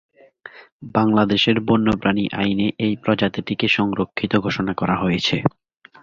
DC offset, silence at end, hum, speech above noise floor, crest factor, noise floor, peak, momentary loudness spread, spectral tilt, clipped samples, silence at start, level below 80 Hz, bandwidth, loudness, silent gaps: under 0.1%; 0.55 s; none; 24 dB; 18 dB; -44 dBFS; -2 dBFS; 6 LU; -6.5 dB/octave; under 0.1%; 0.45 s; -48 dBFS; 7.4 kHz; -20 LUFS; 0.72-0.80 s